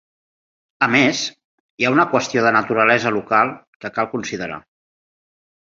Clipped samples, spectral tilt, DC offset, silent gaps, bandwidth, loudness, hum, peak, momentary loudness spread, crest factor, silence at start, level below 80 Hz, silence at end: under 0.1%; -4 dB/octave; under 0.1%; 1.44-1.78 s, 3.67-3.80 s; 7.8 kHz; -18 LUFS; none; -2 dBFS; 13 LU; 18 dB; 0.8 s; -60 dBFS; 1.2 s